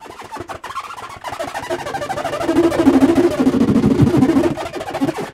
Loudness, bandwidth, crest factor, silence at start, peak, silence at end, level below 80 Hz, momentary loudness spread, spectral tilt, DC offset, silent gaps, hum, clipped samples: -16 LUFS; 15 kHz; 16 dB; 0 s; 0 dBFS; 0 s; -40 dBFS; 17 LU; -6.5 dB/octave; under 0.1%; none; none; under 0.1%